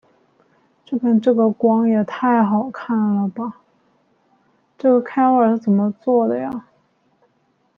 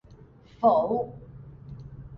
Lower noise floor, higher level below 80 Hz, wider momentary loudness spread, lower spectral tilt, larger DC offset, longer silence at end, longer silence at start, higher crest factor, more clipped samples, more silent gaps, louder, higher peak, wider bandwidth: first, -63 dBFS vs -52 dBFS; second, -68 dBFS vs -54 dBFS; second, 10 LU vs 24 LU; about the same, -10 dB/octave vs -10 dB/octave; neither; first, 1.15 s vs 0 s; first, 0.9 s vs 0.6 s; about the same, 16 dB vs 20 dB; neither; neither; first, -18 LUFS vs -25 LUFS; first, -4 dBFS vs -10 dBFS; second, 4.9 kHz vs 5.6 kHz